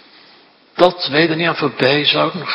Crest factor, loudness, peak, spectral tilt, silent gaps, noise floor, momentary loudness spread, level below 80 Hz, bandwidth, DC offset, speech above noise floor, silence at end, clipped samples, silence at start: 16 dB; -15 LUFS; 0 dBFS; -6.5 dB/octave; none; -48 dBFS; 4 LU; -60 dBFS; 9 kHz; under 0.1%; 33 dB; 0 s; 0.1%; 0.75 s